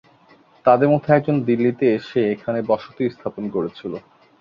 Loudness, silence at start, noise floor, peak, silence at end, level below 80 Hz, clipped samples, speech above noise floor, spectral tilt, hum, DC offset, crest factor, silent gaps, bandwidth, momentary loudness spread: -20 LUFS; 0.65 s; -53 dBFS; -2 dBFS; 0.4 s; -60 dBFS; under 0.1%; 33 dB; -9.5 dB/octave; none; under 0.1%; 18 dB; none; 6.8 kHz; 12 LU